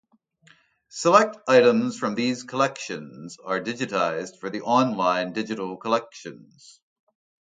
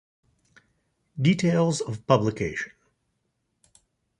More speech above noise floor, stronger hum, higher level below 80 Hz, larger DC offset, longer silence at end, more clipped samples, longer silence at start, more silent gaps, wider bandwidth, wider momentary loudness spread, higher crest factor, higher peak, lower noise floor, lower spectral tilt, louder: second, 35 dB vs 52 dB; neither; second, -74 dBFS vs -58 dBFS; neither; second, 1.15 s vs 1.5 s; neither; second, 0.95 s vs 1.15 s; neither; second, 9.4 kHz vs 11 kHz; first, 19 LU vs 13 LU; about the same, 24 dB vs 24 dB; first, 0 dBFS vs -4 dBFS; second, -59 dBFS vs -76 dBFS; second, -4.5 dB/octave vs -6 dB/octave; about the same, -23 LUFS vs -24 LUFS